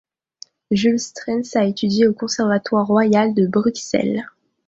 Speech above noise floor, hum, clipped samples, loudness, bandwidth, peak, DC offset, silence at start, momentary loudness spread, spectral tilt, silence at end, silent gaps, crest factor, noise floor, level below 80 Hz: 28 dB; none; under 0.1%; -19 LUFS; 7.8 kHz; -4 dBFS; under 0.1%; 0.7 s; 7 LU; -5.5 dB/octave; 0.4 s; none; 16 dB; -46 dBFS; -58 dBFS